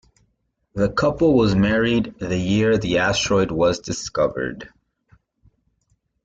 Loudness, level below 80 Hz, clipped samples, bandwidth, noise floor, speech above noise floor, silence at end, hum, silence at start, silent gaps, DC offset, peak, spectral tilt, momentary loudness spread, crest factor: -20 LUFS; -44 dBFS; under 0.1%; 9 kHz; -70 dBFS; 50 dB; 1.6 s; none; 0.75 s; none; under 0.1%; -6 dBFS; -5.5 dB/octave; 9 LU; 16 dB